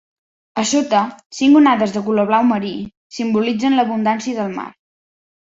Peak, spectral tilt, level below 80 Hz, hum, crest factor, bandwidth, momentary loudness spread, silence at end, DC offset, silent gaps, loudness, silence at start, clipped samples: -2 dBFS; -4.5 dB/octave; -60 dBFS; none; 16 dB; 8 kHz; 15 LU; 0.7 s; under 0.1%; 1.26-1.30 s, 2.97-3.10 s; -17 LUFS; 0.55 s; under 0.1%